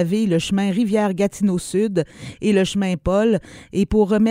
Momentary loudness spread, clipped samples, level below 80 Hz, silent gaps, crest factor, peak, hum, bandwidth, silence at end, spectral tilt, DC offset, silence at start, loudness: 6 LU; under 0.1%; -40 dBFS; none; 14 dB; -6 dBFS; none; 15.5 kHz; 0 s; -6 dB/octave; under 0.1%; 0 s; -20 LUFS